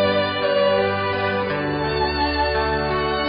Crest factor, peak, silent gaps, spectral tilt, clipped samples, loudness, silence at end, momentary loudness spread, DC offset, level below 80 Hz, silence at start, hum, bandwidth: 12 dB; -8 dBFS; none; -10.5 dB/octave; under 0.1%; -21 LUFS; 0 s; 4 LU; under 0.1%; -36 dBFS; 0 s; none; 5.4 kHz